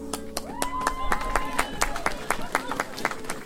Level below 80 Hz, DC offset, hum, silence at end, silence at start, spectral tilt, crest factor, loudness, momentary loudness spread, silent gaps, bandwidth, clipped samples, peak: -38 dBFS; under 0.1%; none; 0 s; 0 s; -2.5 dB/octave; 24 dB; -29 LUFS; 4 LU; none; 16.5 kHz; under 0.1%; -4 dBFS